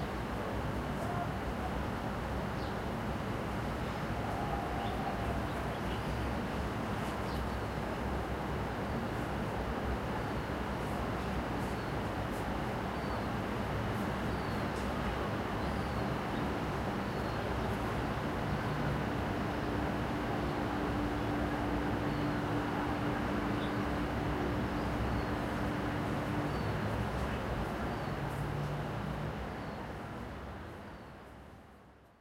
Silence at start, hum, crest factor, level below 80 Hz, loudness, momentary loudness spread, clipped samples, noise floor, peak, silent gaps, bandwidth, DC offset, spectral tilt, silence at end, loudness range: 0 s; none; 14 dB; -44 dBFS; -36 LUFS; 3 LU; under 0.1%; -58 dBFS; -20 dBFS; none; 16 kHz; under 0.1%; -6.5 dB/octave; 0.15 s; 3 LU